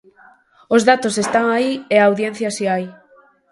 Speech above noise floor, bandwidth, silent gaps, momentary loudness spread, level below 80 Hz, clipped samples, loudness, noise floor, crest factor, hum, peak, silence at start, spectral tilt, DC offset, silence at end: 36 dB; 11.5 kHz; none; 8 LU; -64 dBFS; under 0.1%; -17 LUFS; -52 dBFS; 18 dB; none; 0 dBFS; 0.7 s; -4 dB/octave; under 0.1%; 0.6 s